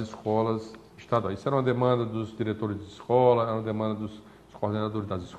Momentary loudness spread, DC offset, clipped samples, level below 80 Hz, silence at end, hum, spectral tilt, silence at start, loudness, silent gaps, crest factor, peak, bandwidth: 12 LU; under 0.1%; under 0.1%; -60 dBFS; 0 s; none; -8 dB/octave; 0 s; -28 LUFS; none; 18 dB; -10 dBFS; 9 kHz